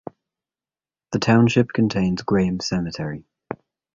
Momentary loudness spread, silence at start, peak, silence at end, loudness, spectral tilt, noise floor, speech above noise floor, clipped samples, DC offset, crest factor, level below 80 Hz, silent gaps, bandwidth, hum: 20 LU; 1.1 s; -2 dBFS; 0.4 s; -21 LUFS; -6.5 dB/octave; under -90 dBFS; over 70 dB; under 0.1%; under 0.1%; 20 dB; -50 dBFS; none; 7.6 kHz; none